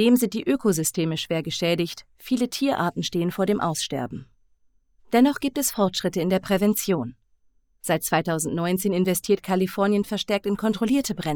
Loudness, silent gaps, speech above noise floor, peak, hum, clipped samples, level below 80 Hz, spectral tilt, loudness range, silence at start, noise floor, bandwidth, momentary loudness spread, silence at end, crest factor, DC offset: -24 LUFS; none; 40 dB; -6 dBFS; none; under 0.1%; -56 dBFS; -4.5 dB/octave; 2 LU; 0 s; -63 dBFS; over 20 kHz; 6 LU; 0 s; 18 dB; under 0.1%